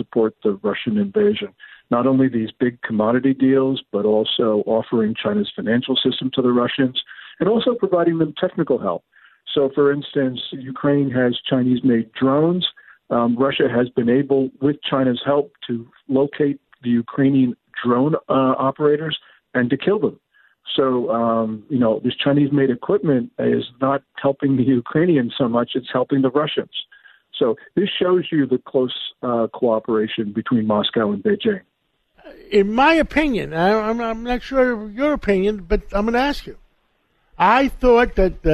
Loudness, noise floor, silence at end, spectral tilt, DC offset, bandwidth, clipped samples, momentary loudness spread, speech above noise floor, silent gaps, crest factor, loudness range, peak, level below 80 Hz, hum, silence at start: -19 LUFS; -67 dBFS; 0 s; -7.5 dB/octave; under 0.1%; 8.2 kHz; under 0.1%; 7 LU; 49 dB; none; 16 dB; 2 LU; -2 dBFS; -40 dBFS; none; 0 s